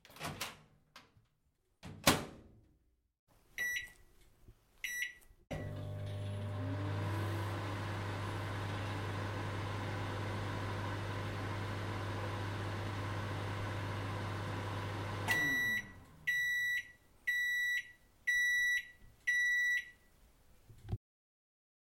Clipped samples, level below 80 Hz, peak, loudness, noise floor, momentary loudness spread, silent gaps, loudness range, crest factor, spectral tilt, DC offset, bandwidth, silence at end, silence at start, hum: under 0.1%; -60 dBFS; -10 dBFS; -37 LUFS; -77 dBFS; 13 LU; 3.19-3.27 s; 8 LU; 28 dB; -4 dB/octave; under 0.1%; 16.5 kHz; 1 s; 0.1 s; none